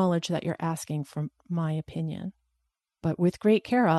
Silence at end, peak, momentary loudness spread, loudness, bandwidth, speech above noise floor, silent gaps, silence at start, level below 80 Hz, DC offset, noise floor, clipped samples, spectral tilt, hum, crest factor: 0 s; -10 dBFS; 12 LU; -29 LUFS; 12.5 kHz; 54 dB; none; 0 s; -64 dBFS; under 0.1%; -81 dBFS; under 0.1%; -7 dB/octave; none; 18 dB